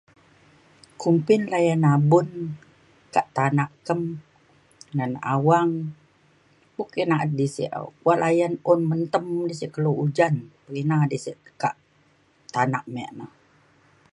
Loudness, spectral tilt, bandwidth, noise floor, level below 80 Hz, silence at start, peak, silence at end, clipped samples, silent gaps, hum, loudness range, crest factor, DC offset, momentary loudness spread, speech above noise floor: -23 LUFS; -7.5 dB/octave; 11 kHz; -61 dBFS; -68 dBFS; 1 s; -4 dBFS; 0.9 s; under 0.1%; none; none; 5 LU; 20 dB; under 0.1%; 15 LU; 39 dB